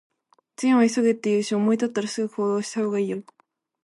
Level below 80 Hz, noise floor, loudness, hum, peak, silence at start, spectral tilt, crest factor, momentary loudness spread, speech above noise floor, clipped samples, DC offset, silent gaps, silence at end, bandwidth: -74 dBFS; -50 dBFS; -23 LUFS; none; -8 dBFS; 0.6 s; -5.5 dB/octave; 16 dB; 8 LU; 27 dB; under 0.1%; under 0.1%; none; 0.6 s; 11.5 kHz